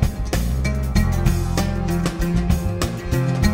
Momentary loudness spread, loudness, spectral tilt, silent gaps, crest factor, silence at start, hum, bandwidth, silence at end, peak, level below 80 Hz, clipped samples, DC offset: 3 LU; -22 LUFS; -6 dB/octave; none; 16 dB; 0 s; none; 16.5 kHz; 0 s; -4 dBFS; -24 dBFS; under 0.1%; under 0.1%